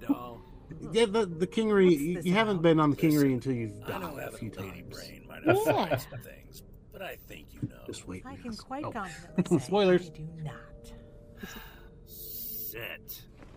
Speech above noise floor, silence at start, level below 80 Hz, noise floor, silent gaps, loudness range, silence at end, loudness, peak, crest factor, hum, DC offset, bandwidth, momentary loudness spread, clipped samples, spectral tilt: 21 dB; 0 s; -54 dBFS; -50 dBFS; none; 13 LU; 0 s; -29 LUFS; -10 dBFS; 20 dB; none; under 0.1%; 16 kHz; 22 LU; under 0.1%; -6 dB/octave